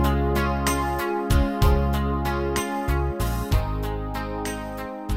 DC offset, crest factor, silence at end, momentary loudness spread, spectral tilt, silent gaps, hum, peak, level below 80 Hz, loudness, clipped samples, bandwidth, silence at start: under 0.1%; 18 dB; 0 s; 8 LU; -6 dB/octave; none; none; -6 dBFS; -28 dBFS; -25 LUFS; under 0.1%; 16.5 kHz; 0 s